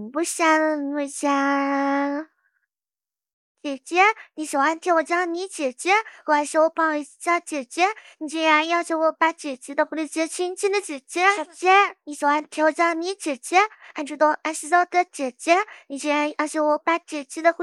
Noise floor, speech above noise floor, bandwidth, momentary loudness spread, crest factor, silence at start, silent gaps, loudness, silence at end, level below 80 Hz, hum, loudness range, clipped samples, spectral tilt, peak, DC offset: under -90 dBFS; over 68 dB; 14.5 kHz; 10 LU; 20 dB; 0 s; 3.33-3.55 s; -22 LUFS; 0 s; -88 dBFS; none; 3 LU; under 0.1%; -1 dB/octave; -4 dBFS; under 0.1%